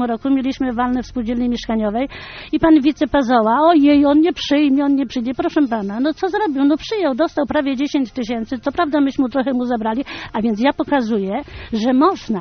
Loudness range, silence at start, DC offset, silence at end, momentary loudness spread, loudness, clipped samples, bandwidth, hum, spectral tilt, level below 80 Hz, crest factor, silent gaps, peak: 5 LU; 0 s; under 0.1%; 0 s; 10 LU; -17 LUFS; under 0.1%; 6.6 kHz; none; -4 dB/octave; -44 dBFS; 14 dB; none; -2 dBFS